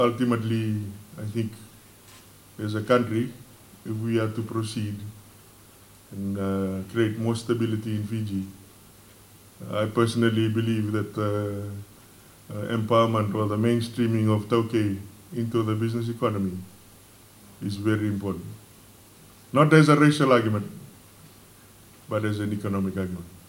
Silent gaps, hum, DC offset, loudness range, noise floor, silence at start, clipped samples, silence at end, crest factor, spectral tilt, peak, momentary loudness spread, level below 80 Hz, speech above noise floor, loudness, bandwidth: none; none; under 0.1%; 8 LU; -51 dBFS; 0 s; under 0.1%; 0.1 s; 24 dB; -7 dB/octave; -2 dBFS; 15 LU; -62 dBFS; 27 dB; -25 LUFS; 17 kHz